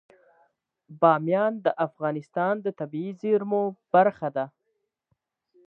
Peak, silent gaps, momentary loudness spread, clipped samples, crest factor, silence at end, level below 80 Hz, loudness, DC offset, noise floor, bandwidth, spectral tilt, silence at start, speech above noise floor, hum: -4 dBFS; none; 11 LU; under 0.1%; 22 dB; 1.2 s; -80 dBFS; -25 LUFS; under 0.1%; -78 dBFS; 5.8 kHz; -9 dB/octave; 0.9 s; 53 dB; none